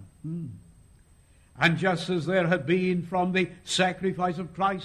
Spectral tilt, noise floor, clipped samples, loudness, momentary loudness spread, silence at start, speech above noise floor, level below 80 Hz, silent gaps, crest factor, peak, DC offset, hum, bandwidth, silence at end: -5.5 dB/octave; -58 dBFS; under 0.1%; -26 LUFS; 12 LU; 0 s; 31 dB; -58 dBFS; none; 20 dB; -8 dBFS; under 0.1%; none; 12 kHz; 0 s